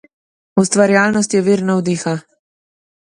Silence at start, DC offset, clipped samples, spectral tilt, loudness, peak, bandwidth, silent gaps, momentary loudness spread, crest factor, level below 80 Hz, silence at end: 0.55 s; under 0.1%; under 0.1%; -5 dB/octave; -15 LUFS; 0 dBFS; 11 kHz; none; 8 LU; 16 dB; -58 dBFS; 0.95 s